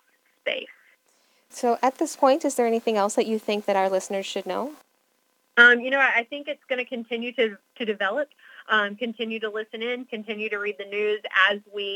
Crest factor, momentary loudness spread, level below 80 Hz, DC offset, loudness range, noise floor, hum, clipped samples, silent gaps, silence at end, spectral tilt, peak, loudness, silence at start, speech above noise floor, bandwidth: 22 dB; 12 LU; under -90 dBFS; under 0.1%; 6 LU; -69 dBFS; none; under 0.1%; none; 0 s; -2.5 dB/octave; -2 dBFS; -24 LUFS; 0.45 s; 45 dB; 18.5 kHz